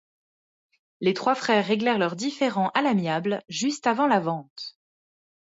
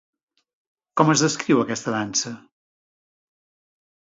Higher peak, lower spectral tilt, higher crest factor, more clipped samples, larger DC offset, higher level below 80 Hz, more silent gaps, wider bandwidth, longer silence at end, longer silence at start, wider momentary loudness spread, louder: second, -8 dBFS vs -2 dBFS; about the same, -5 dB/octave vs -4 dB/octave; second, 18 dB vs 24 dB; neither; neither; second, -74 dBFS vs -66 dBFS; first, 4.50-4.56 s vs none; about the same, 8 kHz vs 7.8 kHz; second, 0.9 s vs 1.7 s; about the same, 1 s vs 0.95 s; second, 9 LU vs 13 LU; second, -24 LUFS vs -21 LUFS